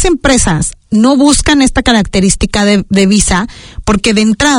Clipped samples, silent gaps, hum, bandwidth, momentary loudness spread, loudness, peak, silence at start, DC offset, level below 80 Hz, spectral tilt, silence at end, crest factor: 0.4%; none; none; 11 kHz; 7 LU; -9 LUFS; 0 dBFS; 0 s; under 0.1%; -22 dBFS; -4 dB/octave; 0 s; 10 dB